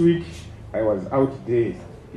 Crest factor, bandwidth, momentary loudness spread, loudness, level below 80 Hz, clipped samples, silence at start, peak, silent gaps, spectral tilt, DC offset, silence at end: 16 dB; 10 kHz; 16 LU; -23 LUFS; -46 dBFS; under 0.1%; 0 s; -8 dBFS; none; -8.5 dB/octave; under 0.1%; 0 s